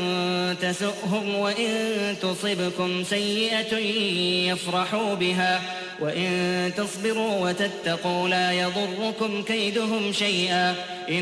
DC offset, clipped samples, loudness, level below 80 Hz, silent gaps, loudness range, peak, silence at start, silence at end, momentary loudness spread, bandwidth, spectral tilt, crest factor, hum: under 0.1%; under 0.1%; -24 LUFS; -66 dBFS; none; 1 LU; -12 dBFS; 0 s; 0 s; 5 LU; 11 kHz; -4 dB/octave; 14 dB; none